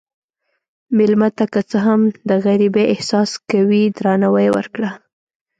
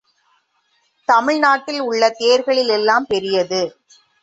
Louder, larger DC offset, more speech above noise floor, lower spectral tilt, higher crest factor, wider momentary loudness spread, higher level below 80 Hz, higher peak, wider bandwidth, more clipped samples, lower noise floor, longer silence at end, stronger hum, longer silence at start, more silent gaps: about the same, -16 LUFS vs -17 LUFS; neither; first, 57 dB vs 48 dB; first, -6.5 dB/octave vs -3 dB/octave; about the same, 14 dB vs 16 dB; about the same, 6 LU vs 7 LU; about the same, -62 dBFS vs -62 dBFS; about the same, -4 dBFS vs -2 dBFS; first, 9 kHz vs 8 kHz; neither; first, -72 dBFS vs -64 dBFS; about the same, 0.6 s vs 0.55 s; neither; second, 0.9 s vs 1.1 s; neither